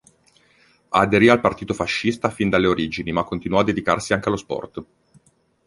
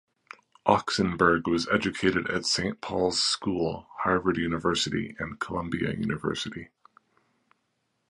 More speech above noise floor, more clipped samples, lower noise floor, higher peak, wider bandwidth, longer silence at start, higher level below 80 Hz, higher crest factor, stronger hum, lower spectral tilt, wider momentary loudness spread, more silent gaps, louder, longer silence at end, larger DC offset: second, 38 dB vs 49 dB; neither; second, -58 dBFS vs -76 dBFS; first, -2 dBFS vs -6 dBFS; about the same, 11.5 kHz vs 11.5 kHz; first, 0.9 s vs 0.65 s; about the same, -48 dBFS vs -52 dBFS; about the same, 20 dB vs 22 dB; neither; first, -5.5 dB/octave vs -4 dB/octave; about the same, 11 LU vs 9 LU; neither; first, -20 LUFS vs -27 LUFS; second, 0.85 s vs 1.45 s; neither